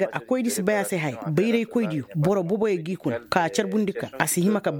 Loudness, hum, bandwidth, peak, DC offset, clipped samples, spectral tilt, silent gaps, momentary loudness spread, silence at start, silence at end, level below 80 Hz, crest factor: -24 LUFS; none; over 20 kHz; -2 dBFS; under 0.1%; under 0.1%; -5.5 dB/octave; none; 5 LU; 0 s; 0 s; -62 dBFS; 22 dB